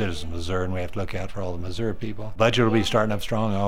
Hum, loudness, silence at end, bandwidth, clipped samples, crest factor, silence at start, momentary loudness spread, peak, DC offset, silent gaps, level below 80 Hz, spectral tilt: none; -25 LUFS; 0 s; 16 kHz; under 0.1%; 20 dB; 0 s; 11 LU; -6 dBFS; 3%; none; -38 dBFS; -6 dB/octave